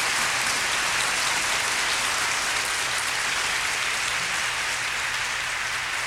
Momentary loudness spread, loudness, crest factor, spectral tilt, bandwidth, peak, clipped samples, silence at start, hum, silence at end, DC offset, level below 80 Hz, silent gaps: 3 LU; -23 LUFS; 16 dB; 0.5 dB/octave; 16.5 kHz; -10 dBFS; under 0.1%; 0 s; none; 0 s; under 0.1%; -54 dBFS; none